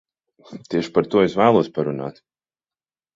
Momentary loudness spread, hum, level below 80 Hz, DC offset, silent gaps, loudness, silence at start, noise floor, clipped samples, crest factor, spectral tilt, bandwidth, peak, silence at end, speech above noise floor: 15 LU; none; -58 dBFS; under 0.1%; none; -20 LUFS; 0.5 s; under -90 dBFS; under 0.1%; 20 dB; -7 dB/octave; 7.6 kHz; -2 dBFS; 1.05 s; over 71 dB